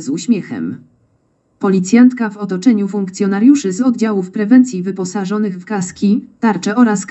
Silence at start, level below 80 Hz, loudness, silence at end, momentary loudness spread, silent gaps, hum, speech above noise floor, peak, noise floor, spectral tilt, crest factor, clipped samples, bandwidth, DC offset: 0 s; -64 dBFS; -14 LUFS; 0.05 s; 10 LU; none; none; 46 dB; 0 dBFS; -59 dBFS; -6 dB/octave; 14 dB; under 0.1%; 8.2 kHz; under 0.1%